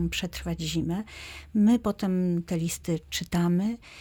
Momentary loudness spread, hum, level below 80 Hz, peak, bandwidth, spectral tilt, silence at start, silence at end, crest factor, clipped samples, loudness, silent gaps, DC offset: 10 LU; none; -46 dBFS; -14 dBFS; 18.5 kHz; -5.5 dB/octave; 0 s; 0 s; 14 dB; under 0.1%; -28 LUFS; none; under 0.1%